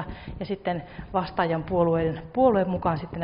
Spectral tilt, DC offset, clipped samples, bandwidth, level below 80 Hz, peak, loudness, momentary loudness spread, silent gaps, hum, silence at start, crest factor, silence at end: -6.5 dB/octave; under 0.1%; under 0.1%; 5.4 kHz; -46 dBFS; -8 dBFS; -26 LUFS; 12 LU; none; none; 0 s; 18 dB; 0 s